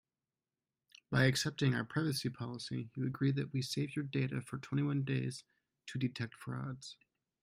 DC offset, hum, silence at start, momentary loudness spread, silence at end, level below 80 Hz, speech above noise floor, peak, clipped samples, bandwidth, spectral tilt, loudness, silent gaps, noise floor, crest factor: under 0.1%; none; 1.1 s; 12 LU; 0.5 s; -70 dBFS; over 54 dB; -16 dBFS; under 0.1%; 15.5 kHz; -5.5 dB/octave; -37 LUFS; none; under -90 dBFS; 22 dB